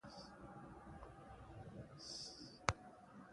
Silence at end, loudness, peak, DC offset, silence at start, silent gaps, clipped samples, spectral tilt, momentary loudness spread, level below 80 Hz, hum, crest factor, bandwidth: 0 s; -51 LUFS; -14 dBFS; under 0.1%; 0.05 s; none; under 0.1%; -3.5 dB/octave; 15 LU; -64 dBFS; none; 38 dB; 11.5 kHz